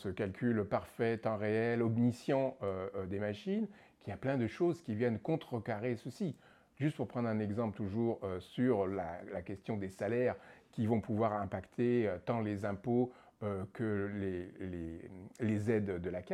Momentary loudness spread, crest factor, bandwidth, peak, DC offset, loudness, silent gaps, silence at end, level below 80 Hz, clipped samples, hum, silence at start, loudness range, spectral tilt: 10 LU; 16 dB; 12.5 kHz; -20 dBFS; under 0.1%; -37 LUFS; none; 0 s; -68 dBFS; under 0.1%; none; 0 s; 3 LU; -8.5 dB/octave